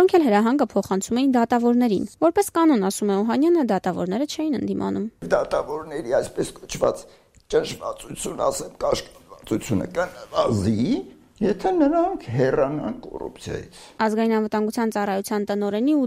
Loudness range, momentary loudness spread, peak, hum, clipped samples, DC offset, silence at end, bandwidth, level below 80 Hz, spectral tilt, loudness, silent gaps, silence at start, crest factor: 6 LU; 11 LU; -6 dBFS; none; under 0.1%; under 0.1%; 0 s; 16 kHz; -50 dBFS; -5.5 dB/octave; -23 LUFS; none; 0 s; 16 dB